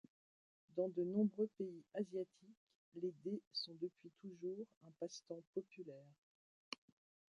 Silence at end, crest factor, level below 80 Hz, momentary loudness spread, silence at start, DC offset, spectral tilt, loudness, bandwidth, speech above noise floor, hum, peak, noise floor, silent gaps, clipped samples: 0.65 s; 20 dB; under -90 dBFS; 16 LU; 0.75 s; under 0.1%; -6 dB/octave; -46 LUFS; 11 kHz; over 44 dB; none; -28 dBFS; under -90 dBFS; 2.57-2.67 s, 2.75-2.92 s, 3.47-3.51 s, 4.77-4.81 s, 5.47-5.53 s, 6.18-6.72 s; under 0.1%